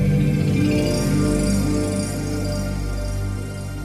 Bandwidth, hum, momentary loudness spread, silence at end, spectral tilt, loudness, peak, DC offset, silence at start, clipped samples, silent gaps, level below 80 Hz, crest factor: 15.5 kHz; 50 Hz at -30 dBFS; 8 LU; 0 s; -6.5 dB/octave; -22 LUFS; -8 dBFS; under 0.1%; 0 s; under 0.1%; none; -30 dBFS; 12 dB